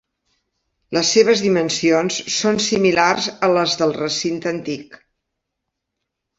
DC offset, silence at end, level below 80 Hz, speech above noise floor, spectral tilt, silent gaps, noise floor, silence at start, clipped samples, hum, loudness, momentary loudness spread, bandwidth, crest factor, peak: under 0.1%; 1.45 s; -58 dBFS; 61 dB; -3.5 dB/octave; none; -79 dBFS; 0.9 s; under 0.1%; none; -17 LUFS; 10 LU; 8 kHz; 18 dB; -2 dBFS